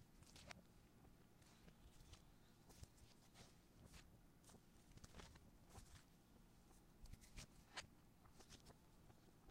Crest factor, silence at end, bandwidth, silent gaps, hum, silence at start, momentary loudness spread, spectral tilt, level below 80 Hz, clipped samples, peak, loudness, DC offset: 30 dB; 0 s; 16 kHz; none; none; 0 s; 10 LU; -3.5 dB/octave; -72 dBFS; under 0.1%; -36 dBFS; -65 LUFS; under 0.1%